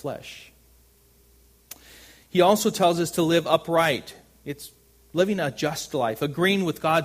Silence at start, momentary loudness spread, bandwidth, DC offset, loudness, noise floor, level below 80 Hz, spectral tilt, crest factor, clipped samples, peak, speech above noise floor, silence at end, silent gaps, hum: 0.05 s; 23 LU; 15.5 kHz; under 0.1%; -23 LUFS; -58 dBFS; -60 dBFS; -4.5 dB/octave; 22 dB; under 0.1%; -4 dBFS; 35 dB; 0 s; none; none